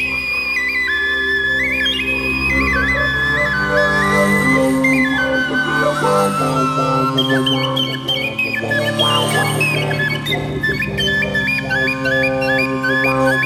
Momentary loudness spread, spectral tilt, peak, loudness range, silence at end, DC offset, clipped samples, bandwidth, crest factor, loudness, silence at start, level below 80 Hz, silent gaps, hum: 4 LU; -4.5 dB/octave; -2 dBFS; 2 LU; 0 s; under 0.1%; under 0.1%; 16 kHz; 14 dB; -15 LUFS; 0 s; -36 dBFS; none; none